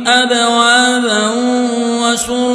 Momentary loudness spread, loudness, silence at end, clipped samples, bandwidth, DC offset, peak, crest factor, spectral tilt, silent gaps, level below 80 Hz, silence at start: 5 LU; -12 LUFS; 0 s; under 0.1%; 11 kHz; under 0.1%; 0 dBFS; 12 dB; -1.5 dB/octave; none; -50 dBFS; 0 s